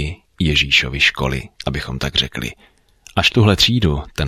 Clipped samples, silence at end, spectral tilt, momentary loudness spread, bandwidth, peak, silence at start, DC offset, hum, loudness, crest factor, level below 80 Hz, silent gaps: under 0.1%; 0 s; -4.5 dB/octave; 12 LU; 16 kHz; 0 dBFS; 0 s; under 0.1%; none; -16 LUFS; 18 dB; -32 dBFS; none